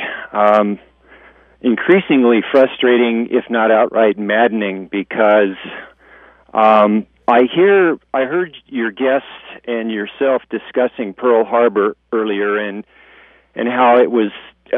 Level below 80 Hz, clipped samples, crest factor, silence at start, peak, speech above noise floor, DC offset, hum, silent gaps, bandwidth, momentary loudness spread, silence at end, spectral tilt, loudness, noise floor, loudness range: -60 dBFS; under 0.1%; 16 dB; 0 s; 0 dBFS; 32 dB; under 0.1%; none; none; 4.9 kHz; 11 LU; 0 s; -8 dB/octave; -15 LUFS; -47 dBFS; 4 LU